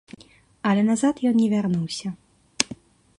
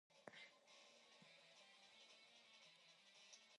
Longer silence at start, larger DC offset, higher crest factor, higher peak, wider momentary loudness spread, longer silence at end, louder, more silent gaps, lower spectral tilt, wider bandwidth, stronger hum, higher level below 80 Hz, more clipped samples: first, 0.65 s vs 0.1 s; neither; about the same, 24 dB vs 28 dB; first, 0 dBFS vs -40 dBFS; first, 14 LU vs 5 LU; first, 0.45 s vs 0 s; first, -23 LUFS vs -66 LUFS; neither; first, -5 dB/octave vs -1 dB/octave; about the same, 11.5 kHz vs 11 kHz; neither; first, -62 dBFS vs under -90 dBFS; neither